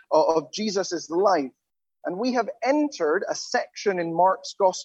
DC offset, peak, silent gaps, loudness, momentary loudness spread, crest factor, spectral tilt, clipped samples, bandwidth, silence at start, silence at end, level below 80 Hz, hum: under 0.1%; -6 dBFS; none; -24 LUFS; 6 LU; 18 dB; -4 dB/octave; under 0.1%; 8.4 kHz; 0.1 s; 0 s; -78 dBFS; none